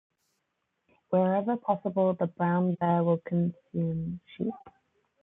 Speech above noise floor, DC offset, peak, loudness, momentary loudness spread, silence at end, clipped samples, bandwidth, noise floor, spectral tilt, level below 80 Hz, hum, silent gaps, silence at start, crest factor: 52 dB; under 0.1%; -12 dBFS; -29 LUFS; 9 LU; 0.55 s; under 0.1%; 3.8 kHz; -80 dBFS; -11.5 dB/octave; -66 dBFS; none; none; 1.1 s; 18 dB